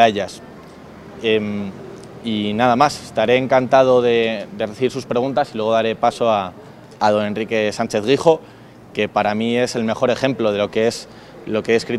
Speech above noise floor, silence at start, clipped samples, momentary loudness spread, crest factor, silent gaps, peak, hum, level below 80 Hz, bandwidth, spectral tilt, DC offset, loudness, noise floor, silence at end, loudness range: 21 dB; 0 s; under 0.1%; 14 LU; 18 dB; none; 0 dBFS; none; -56 dBFS; 13.5 kHz; -5 dB/octave; under 0.1%; -18 LUFS; -39 dBFS; 0 s; 3 LU